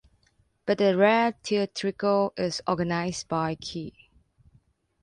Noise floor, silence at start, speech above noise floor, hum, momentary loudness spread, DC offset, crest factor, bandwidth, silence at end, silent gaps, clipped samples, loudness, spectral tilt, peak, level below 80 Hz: -67 dBFS; 0.65 s; 42 dB; none; 14 LU; under 0.1%; 18 dB; 11 kHz; 1.15 s; none; under 0.1%; -26 LUFS; -5 dB/octave; -8 dBFS; -60 dBFS